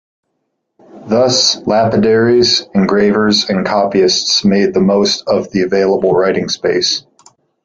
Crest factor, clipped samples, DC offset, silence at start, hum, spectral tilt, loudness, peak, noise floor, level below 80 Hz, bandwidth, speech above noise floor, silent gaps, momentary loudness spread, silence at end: 12 dB; under 0.1%; under 0.1%; 0.95 s; none; -4 dB/octave; -12 LUFS; 0 dBFS; -69 dBFS; -48 dBFS; 7.8 kHz; 57 dB; none; 5 LU; 0.65 s